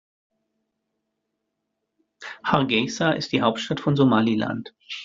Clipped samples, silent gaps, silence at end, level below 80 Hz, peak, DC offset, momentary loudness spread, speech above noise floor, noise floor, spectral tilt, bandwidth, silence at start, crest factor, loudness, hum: under 0.1%; none; 0 s; -62 dBFS; -4 dBFS; under 0.1%; 15 LU; 57 dB; -79 dBFS; -5.5 dB/octave; 7.6 kHz; 2.2 s; 22 dB; -22 LUFS; none